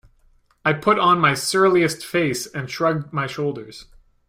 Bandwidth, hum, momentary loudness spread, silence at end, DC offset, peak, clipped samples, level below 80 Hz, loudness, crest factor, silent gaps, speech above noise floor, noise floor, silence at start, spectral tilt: 16 kHz; none; 11 LU; 0.45 s; under 0.1%; -4 dBFS; under 0.1%; -56 dBFS; -20 LUFS; 18 dB; none; 38 dB; -58 dBFS; 0.65 s; -4.5 dB/octave